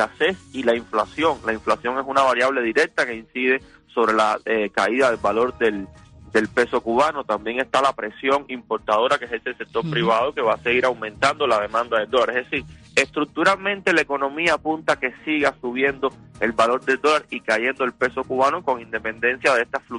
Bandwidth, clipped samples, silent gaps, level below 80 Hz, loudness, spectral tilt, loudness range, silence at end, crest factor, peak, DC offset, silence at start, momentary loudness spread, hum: 11 kHz; under 0.1%; none; -54 dBFS; -21 LUFS; -4 dB/octave; 1 LU; 0 s; 18 dB; -4 dBFS; under 0.1%; 0 s; 6 LU; none